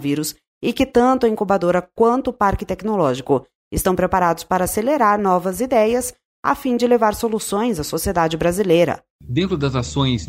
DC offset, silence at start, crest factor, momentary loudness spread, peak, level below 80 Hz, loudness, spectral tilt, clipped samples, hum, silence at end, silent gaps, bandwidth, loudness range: under 0.1%; 0 s; 16 dB; 7 LU; -4 dBFS; -40 dBFS; -19 LUFS; -5.5 dB/octave; under 0.1%; none; 0 s; 0.48-0.61 s, 3.55-3.71 s, 6.25-6.43 s, 9.10-9.19 s; 16 kHz; 1 LU